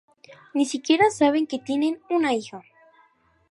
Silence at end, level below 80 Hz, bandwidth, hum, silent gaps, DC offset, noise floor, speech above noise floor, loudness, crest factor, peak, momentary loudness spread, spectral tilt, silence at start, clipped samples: 0.9 s; -70 dBFS; 11.5 kHz; none; none; under 0.1%; -61 dBFS; 39 dB; -23 LUFS; 18 dB; -6 dBFS; 11 LU; -3.5 dB/octave; 0.3 s; under 0.1%